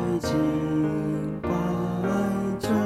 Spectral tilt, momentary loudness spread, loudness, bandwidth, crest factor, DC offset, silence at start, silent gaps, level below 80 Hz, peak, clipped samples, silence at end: -7 dB/octave; 3 LU; -26 LUFS; 15 kHz; 12 dB; under 0.1%; 0 s; none; -48 dBFS; -12 dBFS; under 0.1%; 0 s